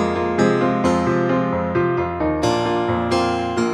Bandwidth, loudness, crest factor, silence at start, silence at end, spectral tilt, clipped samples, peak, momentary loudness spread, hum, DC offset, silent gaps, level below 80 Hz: 11.5 kHz; -19 LUFS; 14 dB; 0 s; 0 s; -6.5 dB/octave; under 0.1%; -4 dBFS; 3 LU; none; under 0.1%; none; -42 dBFS